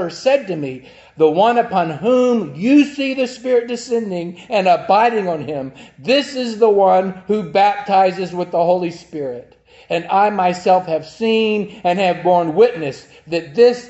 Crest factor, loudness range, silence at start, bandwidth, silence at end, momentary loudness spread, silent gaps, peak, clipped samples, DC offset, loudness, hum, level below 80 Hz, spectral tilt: 16 dB; 2 LU; 0 s; 8.2 kHz; 0 s; 13 LU; none; 0 dBFS; under 0.1%; under 0.1%; -16 LUFS; none; -60 dBFS; -5.5 dB/octave